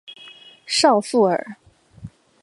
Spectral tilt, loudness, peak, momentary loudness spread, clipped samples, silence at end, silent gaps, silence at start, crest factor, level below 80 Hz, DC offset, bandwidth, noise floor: -3.5 dB/octave; -18 LUFS; -2 dBFS; 24 LU; under 0.1%; 0.35 s; none; 0.1 s; 20 dB; -60 dBFS; under 0.1%; 11.5 kHz; -45 dBFS